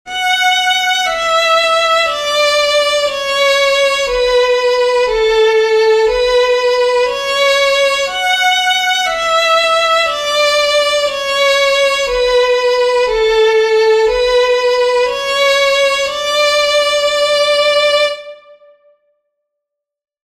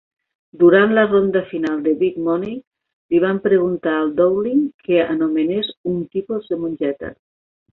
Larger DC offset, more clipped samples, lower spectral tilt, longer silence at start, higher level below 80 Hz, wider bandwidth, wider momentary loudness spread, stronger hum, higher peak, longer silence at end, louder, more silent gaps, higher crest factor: neither; neither; second, 0.5 dB/octave vs -8.5 dB/octave; second, 0.05 s vs 0.55 s; first, -42 dBFS vs -56 dBFS; first, 15 kHz vs 4.1 kHz; second, 3 LU vs 11 LU; neither; about the same, -2 dBFS vs -2 dBFS; first, 1.9 s vs 0.65 s; first, -12 LUFS vs -18 LUFS; second, none vs 2.67-2.71 s, 2.93-3.09 s, 4.74-4.79 s, 5.77-5.84 s; about the same, 12 dB vs 16 dB